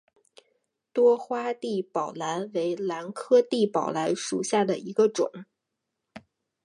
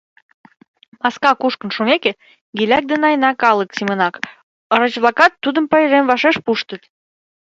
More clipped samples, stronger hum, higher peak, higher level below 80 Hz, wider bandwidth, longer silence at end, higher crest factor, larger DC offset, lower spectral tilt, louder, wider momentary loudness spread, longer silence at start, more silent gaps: neither; neither; second, -10 dBFS vs 0 dBFS; second, -78 dBFS vs -62 dBFS; first, 11.5 kHz vs 7.8 kHz; second, 0.45 s vs 0.8 s; about the same, 18 dB vs 18 dB; neither; about the same, -4.5 dB/octave vs -5 dB/octave; second, -26 LUFS vs -15 LUFS; about the same, 9 LU vs 9 LU; about the same, 0.95 s vs 1.05 s; second, none vs 2.41-2.53 s, 4.43-4.70 s